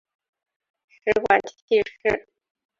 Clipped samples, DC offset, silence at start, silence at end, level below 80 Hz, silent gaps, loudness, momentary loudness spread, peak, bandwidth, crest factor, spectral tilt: under 0.1%; under 0.1%; 1.05 s; 0.6 s; -56 dBFS; 1.62-1.68 s; -23 LUFS; 8 LU; -2 dBFS; 7.4 kHz; 22 dB; -4.5 dB/octave